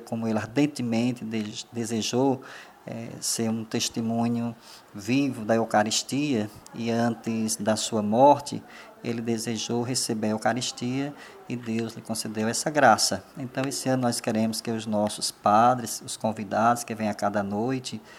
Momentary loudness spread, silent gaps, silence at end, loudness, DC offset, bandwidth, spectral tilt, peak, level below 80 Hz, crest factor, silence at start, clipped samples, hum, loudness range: 14 LU; none; 0 s; -26 LUFS; under 0.1%; 16 kHz; -4 dB/octave; -4 dBFS; -68 dBFS; 22 dB; 0 s; under 0.1%; none; 4 LU